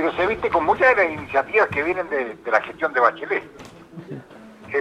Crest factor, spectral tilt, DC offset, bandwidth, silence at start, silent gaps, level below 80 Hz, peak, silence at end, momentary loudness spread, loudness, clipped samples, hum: 18 dB; -6 dB/octave; under 0.1%; 11 kHz; 0 s; none; -52 dBFS; -2 dBFS; 0 s; 21 LU; -20 LUFS; under 0.1%; none